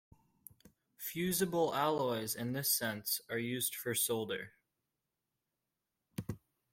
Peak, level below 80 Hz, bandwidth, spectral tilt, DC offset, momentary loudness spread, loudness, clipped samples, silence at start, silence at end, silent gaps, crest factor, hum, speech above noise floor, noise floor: -20 dBFS; -72 dBFS; 16.5 kHz; -3.5 dB/octave; under 0.1%; 13 LU; -35 LUFS; under 0.1%; 1 s; 0.35 s; none; 20 dB; none; 53 dB; -88 dBFS